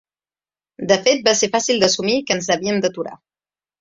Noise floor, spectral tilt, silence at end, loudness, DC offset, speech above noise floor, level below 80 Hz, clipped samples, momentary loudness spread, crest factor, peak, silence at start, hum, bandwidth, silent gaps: under -90 dBFS; -2.5 dB/octave; 0.65 s; -17 LUFS; under 0.1%; over 72 dB; -60 dBFS; under 0.1%; 11 LU; 20 dB; 0 dBFS; 0.8 s; none; 7.8 kHz; none